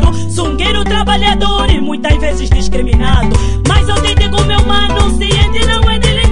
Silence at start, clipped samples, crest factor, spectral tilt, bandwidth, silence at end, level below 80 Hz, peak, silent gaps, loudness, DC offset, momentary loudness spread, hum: 0 s; under 0.1%; 10 dB; -5 dB/octave; 11 kHz; 0 s; -14 dBFS; 0 dBFS; none; -12 LUFS; 9%; 3 LU; none